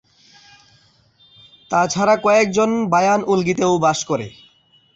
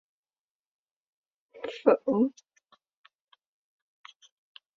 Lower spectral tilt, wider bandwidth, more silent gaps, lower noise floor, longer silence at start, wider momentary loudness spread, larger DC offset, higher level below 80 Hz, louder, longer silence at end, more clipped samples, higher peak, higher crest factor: second, -4.5 dB/octave vs -7 dB/octave; first, 8.2 kHz vs 7.4 kHz; neither; second, -55 dBFS vs under -90 dBFS; first, 1.7 s vs 1.55 s; second, 8 LU vs 16 LU; neither; first, -58 dBFS vs -78 dBFS; first, -17 LUFS vs -27 LUFS; second, 0.65 s vs 2.5 s; neither; about the same, -4 dBFS vs -6 dBFS; second, 16 dB vs 28 dB